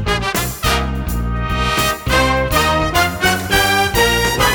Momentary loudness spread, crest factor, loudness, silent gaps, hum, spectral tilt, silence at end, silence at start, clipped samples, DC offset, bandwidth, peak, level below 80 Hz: 7 LU; 14 dB; -15 LUFS; none; none; -3.5 dB/octave; 0 s; 0 s; under 0.1%; under 0.1%; over 20 kHz; -2 dBFS; -24 dBFS